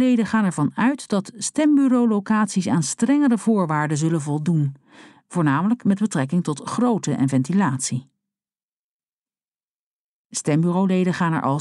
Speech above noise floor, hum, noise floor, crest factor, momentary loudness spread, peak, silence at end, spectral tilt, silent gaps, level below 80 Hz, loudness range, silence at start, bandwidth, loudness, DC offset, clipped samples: over 70 dB; none; under -90 dBFS; 14 dB; 7 LU; -8 dBFS; 0 s; -6 dB/octave; 8.63-9.00 s, 9.08-9.26 s, 9.48-9.52 s, 9.63-10.30 s; -68 dBFS; 7 LU; 0 s; 12 kHz; -21 LUFS; under 0.1%; under 0.1%